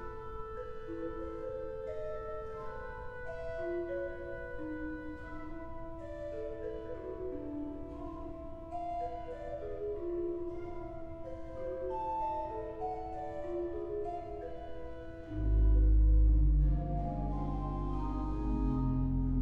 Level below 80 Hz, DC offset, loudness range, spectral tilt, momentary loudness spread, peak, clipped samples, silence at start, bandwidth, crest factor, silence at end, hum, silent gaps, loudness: -36 dBFS; under 0.1%; 11 LU; -10 dB/octave; 15 LU; -20 dBFS; under 0.1%; 0 s; 3.7 kHz; 16 dB; 0 s; none; none; -38 LUFS